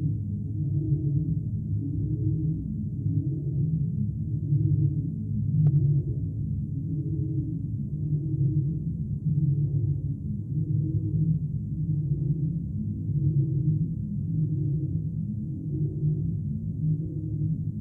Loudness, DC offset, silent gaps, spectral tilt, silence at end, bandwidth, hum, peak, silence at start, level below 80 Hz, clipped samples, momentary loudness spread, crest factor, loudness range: -28 LUFS; under 0.1%; none; -15 dB/octave; 0 s; 0.8 kHz; none; -14 dBFS; 0 s; -42 dBFS; under 0.1%; 6 LU; 14 dB; 3 LU